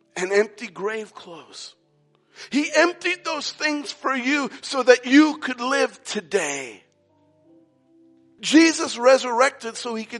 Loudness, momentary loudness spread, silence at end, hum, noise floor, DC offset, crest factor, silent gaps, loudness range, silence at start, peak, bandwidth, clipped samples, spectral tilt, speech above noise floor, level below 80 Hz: -21 LUFS; 17 LU; 0 s; none; -63 dBFS; under 0.1%; 22 dB; none; 5 LU; 0.15 s; -2 dBFS; 11.5 kHz; under 0.1%; -2.5 dB/octave; 42 dB; -80 dBFS